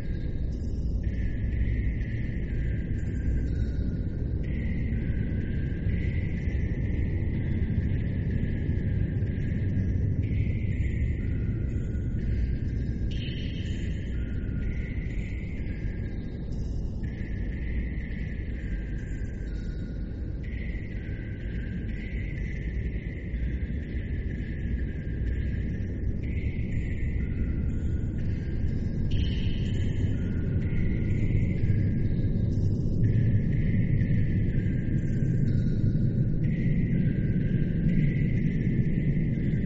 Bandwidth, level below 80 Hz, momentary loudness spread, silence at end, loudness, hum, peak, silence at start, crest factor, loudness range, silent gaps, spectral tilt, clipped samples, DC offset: 7.6 kHz; -32 dBFS; 8 LU; 0 s; -30 LUFS; none; -12 dBFS; 0 s; 16 dB; 8 LU; none; -9 dB/octave; under 0.1%; under 0.1%